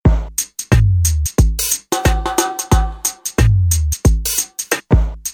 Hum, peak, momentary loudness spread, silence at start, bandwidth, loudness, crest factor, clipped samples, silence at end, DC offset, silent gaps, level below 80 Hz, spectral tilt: none; 0 dBFS; 6 LU; 0.05 s; 19.5 kHz; -16 LUFS; 14 dB; under 0.1%; 0 s; under 0.1%; none; -20 dBFS; -4.5 dB/octave